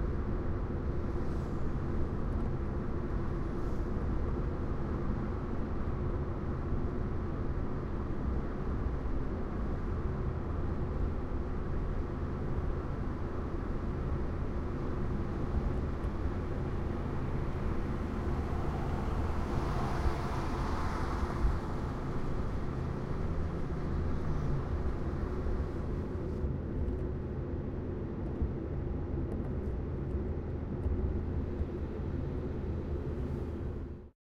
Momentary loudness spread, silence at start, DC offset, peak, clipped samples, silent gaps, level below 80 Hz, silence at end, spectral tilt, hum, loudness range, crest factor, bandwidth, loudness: 3 LU; 0 s; under 0.1%; -16 dBFS; under 0.1%; none; -38 dBFS; 0.15 s; -9 dB/octave; none; 2 LU; 16 dB; 8 kHz; -37 LUFS